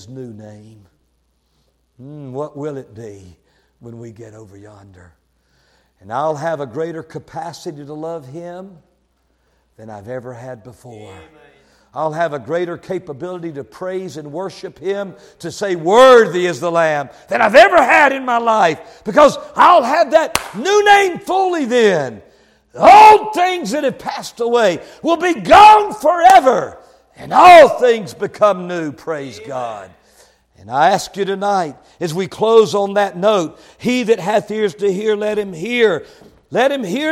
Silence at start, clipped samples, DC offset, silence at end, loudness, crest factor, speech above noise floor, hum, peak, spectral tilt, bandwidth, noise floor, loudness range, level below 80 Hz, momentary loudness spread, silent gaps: 0.1 s; under 0.1%; under 0.1%; 0 s; -13 LUFS; 14 dB; 48 dB; none; 0 dBFS; -4 dB/octave; 16.5 kHz; -62 dBFS; 21 LU; -52 dBFS; 22 LU; none